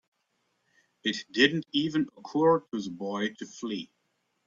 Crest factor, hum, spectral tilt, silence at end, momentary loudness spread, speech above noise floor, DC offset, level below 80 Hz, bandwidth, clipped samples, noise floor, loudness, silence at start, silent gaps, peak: 22 dB; none; -4.5 dB/octave; 0.6 s; 12 LU; 48 dB; under 0.1%; -72 dBFS; 7.6 kHz; under 0.1%; -76 dBFS; -29 LUFS; 1.05 s; none; -8 dBFS